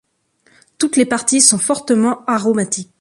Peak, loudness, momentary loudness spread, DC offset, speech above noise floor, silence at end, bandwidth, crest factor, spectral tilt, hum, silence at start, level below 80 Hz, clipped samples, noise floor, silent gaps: 0 dBFS; -14 LUFS; 8 LU; under 0.1%; 43 dB; 0.15 s; 12 kHz; 16 dB; -3 dB/octave; none; 0.8 s; -62 dBFS; under 0.1%; -58 dBFS; none